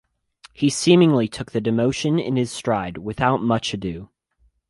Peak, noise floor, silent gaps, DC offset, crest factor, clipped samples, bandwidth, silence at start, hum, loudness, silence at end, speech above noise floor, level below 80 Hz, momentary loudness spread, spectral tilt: -4 dBFS; -63 dBFS; none; under 0.1%; 18 dB; under 0.1%; 11.5 kHz; 0.6 s; none; -21 LUFS; 0.65 s; 43 dB; -50 dBFS; 12 LU; -5.5 dB/octave